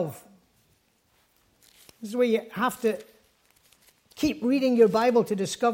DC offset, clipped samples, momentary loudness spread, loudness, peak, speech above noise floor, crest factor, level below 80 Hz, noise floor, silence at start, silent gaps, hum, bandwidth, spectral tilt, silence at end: under 0.1%; under 0.1%; 14 LU; -25 LUFS; -8 dBFS; 43 dB; 20 dB; -64 dBFS; -67 dBFS; 0 s; none; none; 16.5 kHz; -5 dB/octave; 0 s